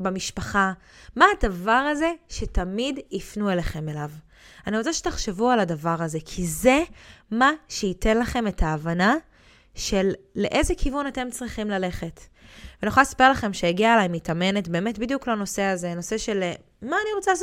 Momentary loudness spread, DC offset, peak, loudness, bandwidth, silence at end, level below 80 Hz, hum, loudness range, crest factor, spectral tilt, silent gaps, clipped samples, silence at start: 12 LU; under 0.1%; -2 dBFS; -24 LUFS; 16.5 kHz; 0 s; -38 dBFS; none; 5 LU; 22 dB; -4.5 dB/octave; none; under 0.1%; 0 s